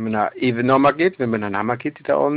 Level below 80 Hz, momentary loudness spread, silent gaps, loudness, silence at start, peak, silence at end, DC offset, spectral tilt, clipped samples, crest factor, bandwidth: -58 dBFS; 7 LU; none; -19 LUFS; 0 s; -6 dBFS; 0 s; under 0.1%; -11.5 dB/octave; under 0.1%; 14 dB; 5 kHz